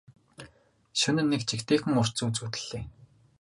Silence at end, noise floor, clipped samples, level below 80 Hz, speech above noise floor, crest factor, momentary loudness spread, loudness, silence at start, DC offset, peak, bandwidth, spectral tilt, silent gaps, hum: 0.35 s; -60 dBFS; under 0.1%; -58 dBFS; 33 dB; 20 dB; 22 LU; -28 LUFS; 0.4 s; under 0.1%; -12 dBFS; 11.5 kHz; -4.5 dB/octave; none; none